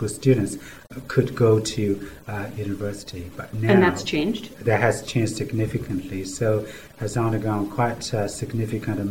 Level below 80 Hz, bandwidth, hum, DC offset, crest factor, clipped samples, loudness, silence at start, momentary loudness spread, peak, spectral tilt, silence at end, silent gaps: -50 dBFS; 17 kHz; none; 0.6%; 20 dB; under 0.1%; -24 LUFS; 0 s; 13 LU; -4 dBFS; -6 dB/octave; 0 s; none